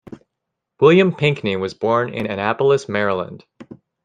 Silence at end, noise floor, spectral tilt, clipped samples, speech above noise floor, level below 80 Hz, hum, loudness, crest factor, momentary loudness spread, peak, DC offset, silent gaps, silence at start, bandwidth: 0.3 s; -80 dBFS; -6.5 dB/octave; under 0.1%; 62 dB; -60 dBFS; none; -18 LUFS; 18 dB; 10 LU; -2 dBFS; under 0.1%; none; 0.1 s; 9.4 kHz